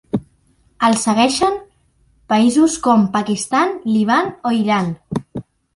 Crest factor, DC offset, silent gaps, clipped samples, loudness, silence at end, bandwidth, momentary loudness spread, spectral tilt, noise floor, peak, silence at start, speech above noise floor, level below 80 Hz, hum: 16 dB; under 0.1%; none; under 0.1%; -17 LUFS; 0.35 s; 11.5 kHz; 12 LU; -4.5 dB/octave; -57 dBFS; -2 dBFS; 0.15 s; 42 dB; -52 dBFS; none